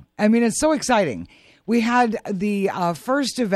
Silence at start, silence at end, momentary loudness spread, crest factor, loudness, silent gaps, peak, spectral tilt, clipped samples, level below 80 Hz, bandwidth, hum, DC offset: 0.2 s; 0 s; 7 LU; 16 dB; -20 LUFS; none; -4 dBFS; -4.5 dB/octave; under 0.1%; -54 dBFS; 13.5 kHz; none; under 0.1%